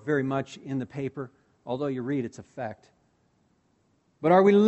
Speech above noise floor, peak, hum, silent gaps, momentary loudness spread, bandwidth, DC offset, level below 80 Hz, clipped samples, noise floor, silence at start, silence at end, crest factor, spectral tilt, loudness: 43 dB; -6 dBFS; none; none; 19 LU; 8.2 kHz; under 0.1%; -68 dBFS; under 0.1%; -68 dBFS; 0.05 s; 0 s; 20 dB; -7.5 dB/octave; -28 LUFS